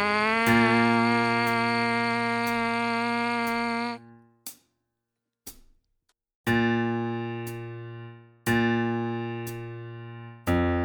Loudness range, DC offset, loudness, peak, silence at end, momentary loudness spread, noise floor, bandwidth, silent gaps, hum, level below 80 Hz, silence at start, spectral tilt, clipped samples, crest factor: 9 LU; under 0.1%; -25 LUFS; -8 dBFS; 0 s; 21 LU; -84 dBFS; over 20 kHz; 6.35-6.44 s; none; -52 dBFS; 0 s; -5.5 dB/octave; under 0.1%; 20 dB